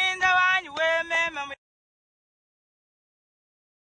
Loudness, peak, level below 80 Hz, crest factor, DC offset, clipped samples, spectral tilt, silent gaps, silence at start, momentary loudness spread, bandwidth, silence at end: -22 LUFS; -10 dBFS; -66 dBFS; 18 dB; under 0.1%; under 0.1%; -0.5 dB/octave; none; 0 s; 16 LU; 9.6 kHz; 2.4 s